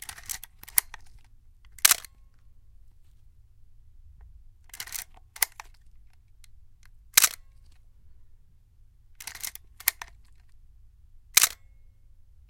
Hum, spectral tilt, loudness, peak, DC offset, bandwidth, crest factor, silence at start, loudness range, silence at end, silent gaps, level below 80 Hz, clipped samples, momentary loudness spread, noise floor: none; 2.5 dB/octave; -25 LUFS; 0 dBFS; under 0.1%; 17 kHz; 32 dB; 0.1 s; 8 LU; 0.95 s; none; -54 dBFS; under 0.1%; 25 LU; -56 dBFS